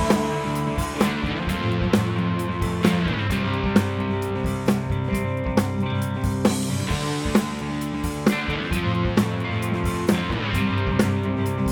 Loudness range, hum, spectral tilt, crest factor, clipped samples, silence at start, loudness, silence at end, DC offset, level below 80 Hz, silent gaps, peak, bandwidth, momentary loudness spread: 1 LU; none; -6 dB/octave; 20 dB; under 0.1%; 0 s; -23 LUFS; 0 s; under 0.1%; -36 dBFS; none; -2 dBFS; 19.5 kHz; 4 LU